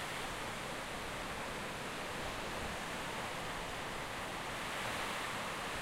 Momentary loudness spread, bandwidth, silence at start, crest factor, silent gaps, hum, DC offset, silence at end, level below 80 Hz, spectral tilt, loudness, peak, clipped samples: 3 LU; 16 kHz; 0 s; 14 dB; none; none; under 0.1%; 0 s; -56 dBFS; -3 dB/octave; -41 LUFS; -28 dBFS; under 0.1%